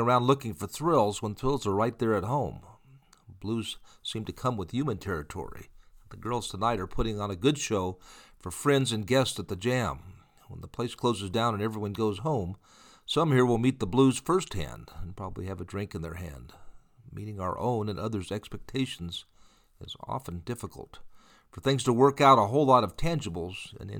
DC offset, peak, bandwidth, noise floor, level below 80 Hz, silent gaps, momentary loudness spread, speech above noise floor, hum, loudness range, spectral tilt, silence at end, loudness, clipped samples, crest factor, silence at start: under 0.1%; -6 dBFS; 19 kHz; -58 dBFS; -48 dBFS; none; 18 LU; 30 dB; none; 10 LU; -5.5 dB/octave; 0 s; -29 LUFS; under 0.1%; 22 dB; 0 s